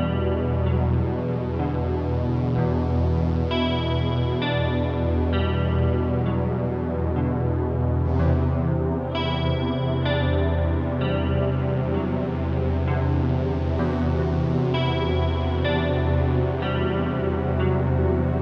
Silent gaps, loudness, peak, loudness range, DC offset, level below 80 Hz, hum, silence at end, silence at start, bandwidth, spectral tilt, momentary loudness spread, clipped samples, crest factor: none; -23 LUFS; -10 dBFS; 1 LU; under 0.1%; -32 dBFS; none; 0 s; 0 s; 5.6 kHz; -9.5 dB/octave; 3 LU; under 0.1%; 12 dB